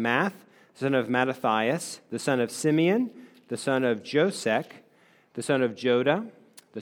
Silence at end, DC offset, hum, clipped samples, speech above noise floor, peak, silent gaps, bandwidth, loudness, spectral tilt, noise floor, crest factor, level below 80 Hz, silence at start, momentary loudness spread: 0 s; under 0.1%; none; under 0.1%; 35 dB; -8 dBFS; none; 19.5 kHz; -26 LUFS; -5 dB/octave; -61 dBFS; 20 dB; -80 dBFS; 0 s; 12 LU